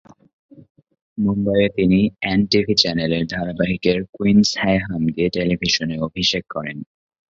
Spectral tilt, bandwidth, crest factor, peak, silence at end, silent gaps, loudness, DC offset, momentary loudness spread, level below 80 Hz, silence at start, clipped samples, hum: -5 dB/octave; 7.6 kHz; 20 dB; 0 dBFS; 0.45 s; 4.09-4.13 s; -19 LUFS; under 0.1%; 9 LU; -44 dBFS; 1.15 s; under 0.1%; none